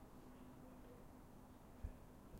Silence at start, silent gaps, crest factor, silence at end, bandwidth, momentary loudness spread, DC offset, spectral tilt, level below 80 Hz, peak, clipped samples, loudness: 0 s; none; 22 dB; 0 s; 16 kHz; 6 LU; under 0.1%; -6.5 dB/octave; -62 dBFS; -36 dBFS; under 0.1%; -60 LUFS